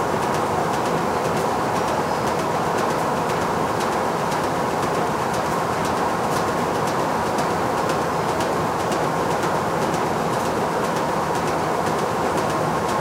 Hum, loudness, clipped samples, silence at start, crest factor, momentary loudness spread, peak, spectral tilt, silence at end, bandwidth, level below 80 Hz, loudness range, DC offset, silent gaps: none; -22 LUFS; under 0.1%; 0 s; 14 dB; 1 LU; -8 dBFS; -5 dB/octave; 0 s; 16 kHz; -48 dBFS; 0 LU; under 0.1%; none